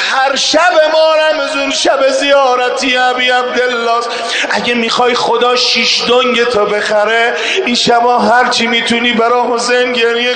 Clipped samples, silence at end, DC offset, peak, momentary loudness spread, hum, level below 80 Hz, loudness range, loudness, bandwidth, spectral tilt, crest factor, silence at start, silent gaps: under 0.1%; 0 s; under 0.1%; 0 dBFS; 4 LU; none; -52 dBFS; 1 LU; -10 LUFS; 9.4 kHz; -2 dB/octave; 10 dB; 0 s; none